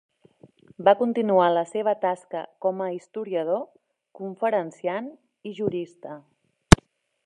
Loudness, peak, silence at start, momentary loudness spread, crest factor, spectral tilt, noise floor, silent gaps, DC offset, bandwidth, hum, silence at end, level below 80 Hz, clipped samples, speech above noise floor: -24 LUFS; 0 dBFS; 0.8 s; 21 LU; 26 dB; -5.5 dB/octave; -56 dBFS; none; under 0.1%; 13 kHz; none; 0.5 s; -38 dBFS; under 0.1%; 31 dB